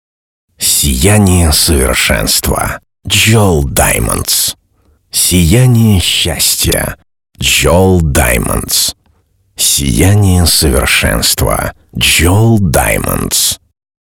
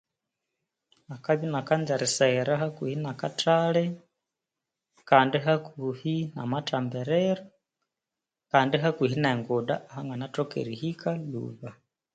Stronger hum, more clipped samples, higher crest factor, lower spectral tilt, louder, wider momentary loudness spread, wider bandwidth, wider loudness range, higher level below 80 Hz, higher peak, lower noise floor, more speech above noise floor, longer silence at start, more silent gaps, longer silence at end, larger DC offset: neither; neither; second, 10 dB vs 24 dB; second, -3.5 dB/octave vs -5.5 dB/octave; first, -9 LUFS vs -27 LUFS; second, 7 LU vs 12 LU; first, 18.5 kHz vs 9.4 kHz; about the same, 2 LU vs 3 LU; first, -22 dBFS vs -70 dBFS; first, 0 dBFS vs -4 dBFS; second, -53 dBFS vs -89 dBFS; second, 44 dB vs 62 dB; second, 0.6 s vs 1.1 s; neither; about the same, 0.55 s vs 0.45 s; neither